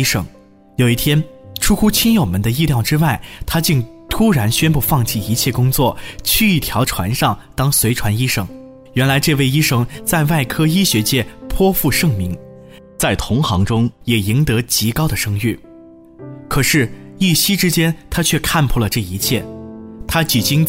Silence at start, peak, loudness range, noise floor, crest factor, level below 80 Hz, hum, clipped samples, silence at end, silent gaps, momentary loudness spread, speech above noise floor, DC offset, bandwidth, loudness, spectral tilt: 0 s; -2 dBFS; 2 LU; -41 dBFS; 14 dB; -32 dBFS; none; under 0.1%; 0 s; none; 9 LU; 25 dB; under 0.1%; 16.5 kHz; -16 LUFS; -4.5 dB/octave